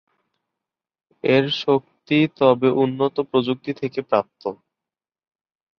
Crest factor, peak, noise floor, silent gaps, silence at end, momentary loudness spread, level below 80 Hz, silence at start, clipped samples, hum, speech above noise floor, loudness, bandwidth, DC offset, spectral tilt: 20 dB; -2 dBFS; -89 dBFS; none; 1.25 s; 10 LU; -66 dBFS; 1.25 s; under 0.1%; none; 69 dB; -20 LUFS; 6.6 kHz; under 0.1%; -7.5 dB/octave